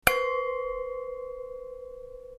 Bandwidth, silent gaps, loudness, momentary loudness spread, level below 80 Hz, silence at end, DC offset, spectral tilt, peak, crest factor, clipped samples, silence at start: 14 kHz; none; -32 LUFS; 15 LU; -52 dBFS; 0 s; under 0.1%; -2 dB/octave; -2 dBFS; 30 dB; under 0.1%; 0.05 s